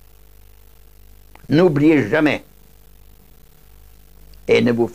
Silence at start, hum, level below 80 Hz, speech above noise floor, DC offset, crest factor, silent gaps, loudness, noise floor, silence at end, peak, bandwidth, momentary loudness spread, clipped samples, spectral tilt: 1.5 s; 50 Hz at -45 dBFS; -48 dBFS; 33 dB; 0.4%; 18 dB; none; -16 LUFS; -48 dBFS; 0 s; -2 dBFS; 16 kHz; 9 LU; under 0.1%; -7 dB/octave